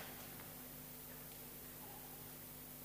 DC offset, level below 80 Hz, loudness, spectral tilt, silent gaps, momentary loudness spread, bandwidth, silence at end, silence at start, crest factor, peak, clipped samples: under 0.1%; -68 dBFS; -51 LUFS; -3 dB/octave; none; 1 LU; 15.5 kHz; 0 s; 0 s; 16 dB; -38 dBFS; under 0.1%